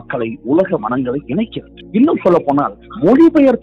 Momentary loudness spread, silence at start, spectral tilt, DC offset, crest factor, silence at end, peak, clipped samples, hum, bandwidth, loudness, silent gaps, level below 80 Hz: 12 LU; 0.1 s; -9 dB/octave; under 0.1%; 12 dB; 0.05 s; -2 dBFS; under 0.1%; none; 5.8 kHz; -14 LUFS; none; -46 dBFS